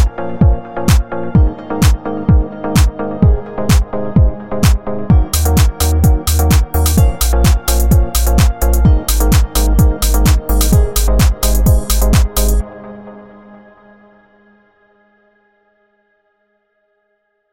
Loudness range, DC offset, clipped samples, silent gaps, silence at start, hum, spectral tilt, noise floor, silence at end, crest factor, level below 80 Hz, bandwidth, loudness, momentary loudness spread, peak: 4 LU; under 0.1%; under 0.1%; none; 0 s; none; -5.5 dB/octave; -64 dBFS; 4.3 s; 12 dB; -14 dBFS; 17 kHz; -13 LUFS; 4 LU; 0 dBFS